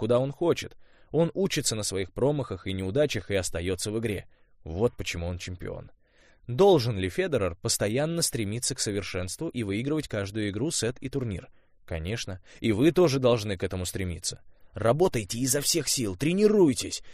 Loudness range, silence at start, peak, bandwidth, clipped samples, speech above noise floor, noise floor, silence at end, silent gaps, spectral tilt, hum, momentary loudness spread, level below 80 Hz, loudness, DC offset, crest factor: 5 LU; 0 s; -8 dBFS; 15.5 kHz; under 0.1%; 32 dB; -59 dBFS; 0 s; none; -4.5 dB/octave; none; 12 LU; -50 dBFS; -27 LUFS; under 0.1%; 18 dB